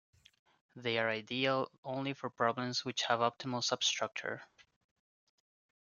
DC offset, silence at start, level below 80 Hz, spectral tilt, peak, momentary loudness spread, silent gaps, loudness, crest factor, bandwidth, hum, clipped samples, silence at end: under 0.1%; 0.75 s; -82 dBFS; -3 dB/octave; -16 dBFS; 9 LU; 1.78-1.83 s; -35 LUFS; 22 dB; 10 kHz; none; under 0.1%; 1.35 s